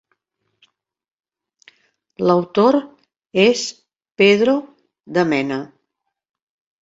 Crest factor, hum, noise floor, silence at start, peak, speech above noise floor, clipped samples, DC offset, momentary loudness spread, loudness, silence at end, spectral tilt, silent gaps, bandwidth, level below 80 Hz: 20 dB; none; -77 dBFS; 2.2 s; -2 dBFS; 61 dB; under 0.1%; under 0.1%; 11 LU; -17 LUFS; 1.15 s; -5 dB/octave; none; 8 kHz; -64 dBFS